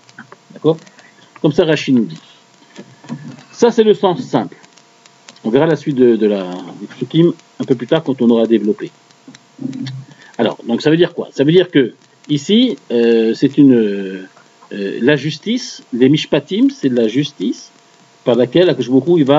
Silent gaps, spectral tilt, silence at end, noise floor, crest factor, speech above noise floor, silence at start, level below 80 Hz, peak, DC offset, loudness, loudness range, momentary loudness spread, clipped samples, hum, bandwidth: none; -6.5 dB/octave; 0 s; -48 dBFS; 14 dB; 34 dB; 0.2 s; -60 dBFS; 0 dBFS; under 0.1%; -14 LUFS; 4 LU; 16 LU; under 0.1%; none; 7.8 kHz